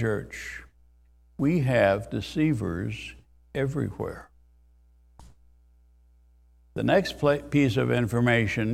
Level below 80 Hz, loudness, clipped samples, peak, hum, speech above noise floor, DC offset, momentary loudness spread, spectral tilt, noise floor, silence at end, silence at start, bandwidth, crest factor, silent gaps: -50 dBFS; -26 LUFS; under 0.1%; -6 dBFS; none; 33 dB; under 0.1%; 16 LU; -7 dB/octave; -59 dBFS; 0 s; 0 s; 14.5 kHz; 20 dB; none